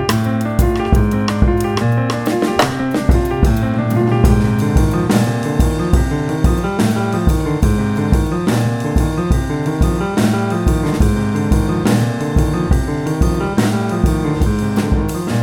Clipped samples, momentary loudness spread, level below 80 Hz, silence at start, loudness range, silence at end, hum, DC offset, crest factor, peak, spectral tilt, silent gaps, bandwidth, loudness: under 0.1%; 3 LU; -20 dBFS; 0 s; 1 LU; 0 s; none; under 0.1%; 14 dB; 0 dBFS; -7 dB/octave; none; 17.5 kHz; -16 LUFS